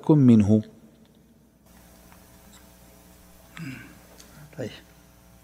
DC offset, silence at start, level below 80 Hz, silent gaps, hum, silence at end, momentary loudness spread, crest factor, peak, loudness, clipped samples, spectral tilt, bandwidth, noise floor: under 0.1%; 0.05 s; -58 dBFS; none; none; 0.75 s; 30 LU; 20 dB; -6 dBFS; -20 LUFS; under 0.1%; -8.5 dB/octave; 15.5 kHz; -57 dBFS